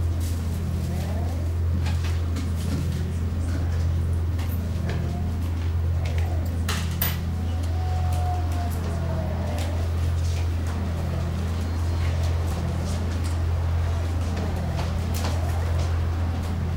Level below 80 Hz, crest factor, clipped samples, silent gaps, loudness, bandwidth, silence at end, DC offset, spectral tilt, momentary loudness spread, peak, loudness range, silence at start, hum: -34 dBFS; 14 dB; under 0.1%; none; -26 LUFS; 16 kHz; 0 s; 0.2%; -6.5 dB/octave; 2 LU; -10 dBFS; 1 LU; 0 s; none